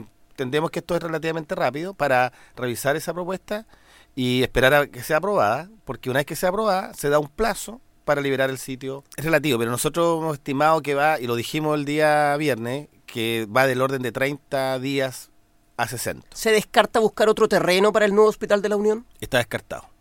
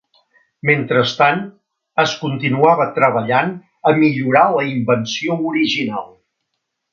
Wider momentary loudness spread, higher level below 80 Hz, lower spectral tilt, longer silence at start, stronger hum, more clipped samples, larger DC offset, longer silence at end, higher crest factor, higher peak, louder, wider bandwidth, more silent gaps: first, 13 LU vs 9 LU; first, -48 dBFS vs -62 dBFS; about the same, -4.5 dB/octave vs -5.5 dB/octave; second, 0 s vs 0.65 s; neither; neither; neither; second, 0.2 s vs 0.85 s; about the same, 20 dB vs 16 dB; about the same, -2 dBFS vs 0 dBFS; second, -22 LUFS vs -16 LUFS; first, 17 kHz vs 7.4 kHz; neither